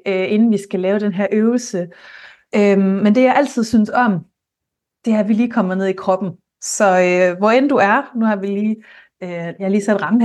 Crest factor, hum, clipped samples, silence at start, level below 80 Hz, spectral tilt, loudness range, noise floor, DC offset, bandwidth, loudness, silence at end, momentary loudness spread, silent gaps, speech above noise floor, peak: 14 dB; none; under 0.1%; 0.05 s; -62 dBFS; -6 dB/octave; 2 LU; -81 dBFS; under 0.1%; 12 kHz; -16 LUFS; 0 s; 12 LU; none; 65 dB; -2 dBFS